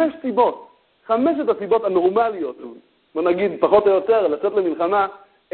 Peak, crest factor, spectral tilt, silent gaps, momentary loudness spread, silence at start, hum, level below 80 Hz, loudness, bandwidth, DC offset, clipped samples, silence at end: -2 dBFS; 18 dB; -10.5 dB/octave; none; 13 LU; 0 s; none; -60 dBFS; -19 LUFS; 4.4 kHz; under 0.1%; under 0.1%; 0 s